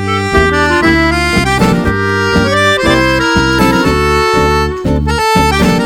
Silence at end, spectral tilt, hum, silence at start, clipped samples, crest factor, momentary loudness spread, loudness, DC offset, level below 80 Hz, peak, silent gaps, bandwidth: 0 s; -5 dB/octave; none; 0 s; under 0.1%; 10 dB; 3 LU; -10 LUFS; under 0.1%; -22 dBFS; 0 dBFS; none; 19.5 kHz